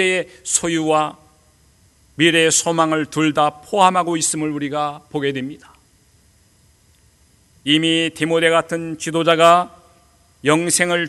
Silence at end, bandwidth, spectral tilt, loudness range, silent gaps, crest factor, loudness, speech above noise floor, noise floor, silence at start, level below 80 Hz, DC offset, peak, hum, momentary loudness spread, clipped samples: 0 s; 12.5 kHz; -3 dB/octave; 7 LU; none; 20 dB; -17 LUFS; 37 dB; -55 dBFS; 0 s; -58 dBFS; under 0.1%; 0 dBFS; none; 11 LU; under 0.1%